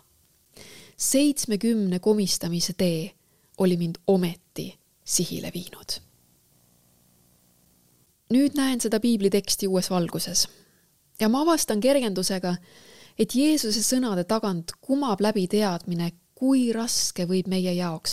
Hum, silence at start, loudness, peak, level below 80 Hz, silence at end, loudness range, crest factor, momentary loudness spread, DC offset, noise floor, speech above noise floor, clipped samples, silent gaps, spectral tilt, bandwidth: none; 0.45 s; -24 LUFS; -8 dBFS; -58 dBFS; 0 s; 6 LU; 18 dB; 12 LU; 0.3%; -63 dBFS; 39 dB; under 0.1%; none; -4.5 dB/octave; 16 kHz